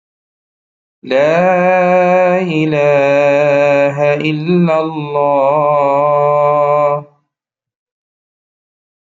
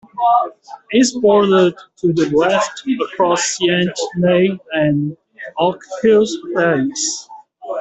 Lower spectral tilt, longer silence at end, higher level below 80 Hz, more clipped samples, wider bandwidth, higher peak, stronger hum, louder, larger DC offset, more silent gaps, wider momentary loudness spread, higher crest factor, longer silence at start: first, -7.5 dB/octave vs -4.5 dB/octave; first, 2.05 s vs 0 s; second, -62 dBFS vs -56 dBFS; neither; second, 7.4 kHz vs 8.4 kHz; about the same, -2 dBFS vs -2 dBFS; neither; first, -12 LUFS vs -16 LUFS; neither; neither; second, 5 LU vs 8 LU; about the same, 12 dB vs 14 dB; first, 1.05 s vs 0.15 s